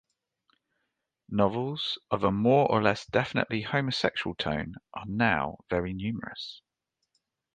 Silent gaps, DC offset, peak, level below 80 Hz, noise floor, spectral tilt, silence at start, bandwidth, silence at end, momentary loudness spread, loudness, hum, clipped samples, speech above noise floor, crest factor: none; under 0.1%; -8 dBFS; -54 dBFS; -82 dBFS; -6.5 dB/octave; 1.3 s; 9.2 kHz; 1 s; 13 LU; -28 LUFS; none; under 0.1%; 53 dB; 22 dB